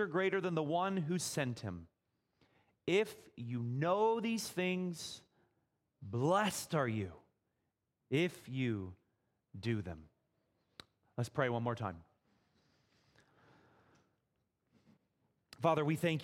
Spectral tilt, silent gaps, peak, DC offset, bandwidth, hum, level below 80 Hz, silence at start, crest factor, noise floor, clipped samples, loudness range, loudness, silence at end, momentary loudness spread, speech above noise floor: -5.5 dB/octave; none; -18 dBFS; under 0.1%; 16.5 kHz; none; -72 dBFS; 0 s; 22 dB; -85 dBFS; under 0.1%; 6 LU; -37 LUFS; 0 s; 15 LU; 49 dB